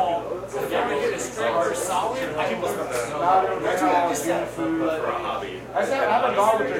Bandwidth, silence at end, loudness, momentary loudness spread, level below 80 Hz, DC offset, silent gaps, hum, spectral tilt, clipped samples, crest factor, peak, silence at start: 16.5 kHz; 0 s; -24 LUFS; 7 LU; -54 dBFS; under 0.1%; none; none; -4 dB/octave; under 0.1%; 16 dB; -8 dBFS; 0 s